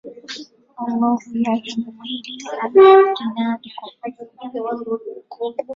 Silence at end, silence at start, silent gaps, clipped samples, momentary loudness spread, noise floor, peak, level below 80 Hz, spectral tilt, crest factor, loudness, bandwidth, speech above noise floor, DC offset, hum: 0 s; 0.05 s; none; under 0.1%; 22 LU; -36 dBFS; -2 dBFS; -66 dBFS; -5 dB/octave; 18 dB; -18 LUFS; 7.4 kHz; 18 dB; under 0.1%; none